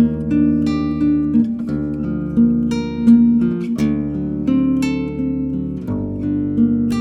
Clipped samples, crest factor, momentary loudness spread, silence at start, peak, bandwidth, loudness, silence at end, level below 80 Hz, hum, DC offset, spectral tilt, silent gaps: under 0.1%; 14 dB; 8 LU; 0 s; -2 dBFS; 8 kHz; -18 LUFS; 0 s; -38 dBFS; none; under 0.1%; -8.5 dB/octave; none